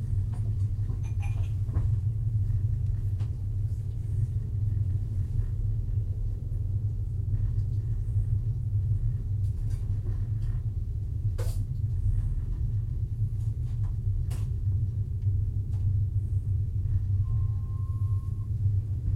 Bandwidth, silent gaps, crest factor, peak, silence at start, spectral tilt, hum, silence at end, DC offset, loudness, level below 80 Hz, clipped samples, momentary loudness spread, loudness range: 3 kHz; none; 12 dB; -16 dBFS; 0 s; -9 dB/octave; none; 0 s; under 0.1%; -30 LUFS; -34 dBFS; under 0.1%; 3 LU; 2 LU